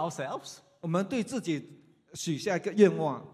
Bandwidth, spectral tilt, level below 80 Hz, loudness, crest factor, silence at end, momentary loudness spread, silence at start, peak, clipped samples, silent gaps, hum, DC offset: 14 kHz; -5.5 dB/octave; -74 dBFS; -30 LUFS; 22 dB; 0.05 s; 17 LU; 0 s; -8 dBFS; under 0.1%; none; none; under 0.1%